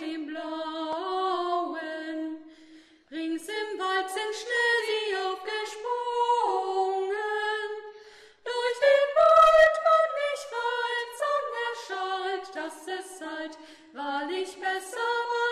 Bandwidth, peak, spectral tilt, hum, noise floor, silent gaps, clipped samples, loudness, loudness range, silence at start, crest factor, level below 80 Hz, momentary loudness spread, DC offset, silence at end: 13 kHz; -8 dBFS; -1.5 dB/octave; none; -54 dBFS; none; under 0.1%; -27 LUFS; 10 LU; 0 s; 20 dB; -64 dBFS; 16 LU; under 0.1%; 0 s